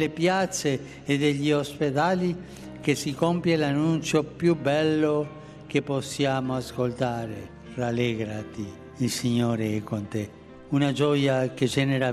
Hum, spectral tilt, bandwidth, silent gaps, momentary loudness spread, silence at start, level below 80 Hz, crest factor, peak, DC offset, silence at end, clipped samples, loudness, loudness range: none; -5.5 dB/octave; 14 kHz; none; 11 LU; 0 s; -56 dBFS; 18 dB; -8 dBFS; under 0.1%; 0 s; under 0.1%; -26 LUFS; 4 LU